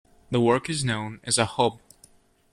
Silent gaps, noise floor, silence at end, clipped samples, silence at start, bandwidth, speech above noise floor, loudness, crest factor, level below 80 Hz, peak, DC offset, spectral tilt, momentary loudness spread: none; -58 dBFS; 0.75 s; under 0.1%; 0.3 s; 13.5 kHz; 33 dB; -25 LUFS; 20 dB; -58 dBFS; -8 dBFS; under 0.1%; -4 dB/octave; 6 LU